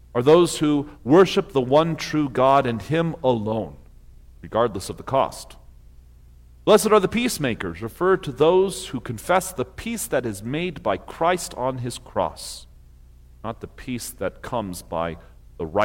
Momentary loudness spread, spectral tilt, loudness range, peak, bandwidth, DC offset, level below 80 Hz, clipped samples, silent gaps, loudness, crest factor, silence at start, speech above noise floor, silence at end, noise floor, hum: 16 LU; -5 dB/octave; 10 LU; -4 dBFS; 17 kHz; under 0.1%; -46 dBFS; under 0.1%; none; -22 LUFS; 18 dB; 0.15 s; 26 dB; 0 s; -48 dBFS; 60 Hz at -50 dBFS